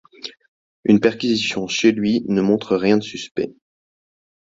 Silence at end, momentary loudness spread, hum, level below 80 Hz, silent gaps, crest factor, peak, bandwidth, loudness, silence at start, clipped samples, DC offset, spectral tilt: 0.95 s; 13 LU; none; -58 dBFS; 0.48-0.83 s, 3.31-3.35 s; 18 dB; -2 dBFS; 7.8 kHz; -19 LUFS; 0.25 s; under 0.1%; under 0.1%; -5 dB/octave